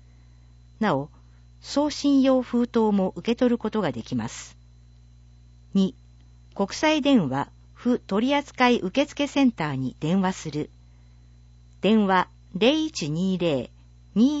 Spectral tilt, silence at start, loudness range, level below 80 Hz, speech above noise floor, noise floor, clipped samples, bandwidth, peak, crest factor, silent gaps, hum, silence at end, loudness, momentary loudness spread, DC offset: -5.5 dB/octave; 0.8 s; 4 LU; -52 dBFS; 28 dB; -51 dBFS; under 0.1%; 8 kHz; -6 dBFS; 18 dB; none; 60 Hz at -45 dBFS; 0 s; -24 LUFS; 11 LU; under 0.1%